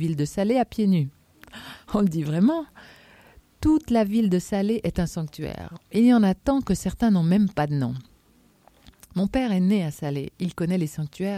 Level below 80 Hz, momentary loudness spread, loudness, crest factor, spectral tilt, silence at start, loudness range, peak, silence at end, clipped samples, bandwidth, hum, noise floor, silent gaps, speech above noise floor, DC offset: -46 dBFS; 12 LU; -24 LUFS; 16 dB; -7.5 dB/octave; 0 s; 4 LU; -8 dBFS; 0 s; under 0.1%; 15 kHz; none; -59 dBFS; none; 36 dB; under 0.1%